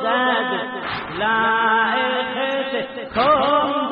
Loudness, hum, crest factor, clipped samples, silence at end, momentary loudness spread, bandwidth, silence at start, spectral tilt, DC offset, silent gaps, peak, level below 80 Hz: -19 LUFS; none; 14 dB; under 0.1%; 0 s; 9 LU; 5.2 kHz; 0 s; -1 dB/octave; under 0.1%; none; -6 dBFS; -52 dBFS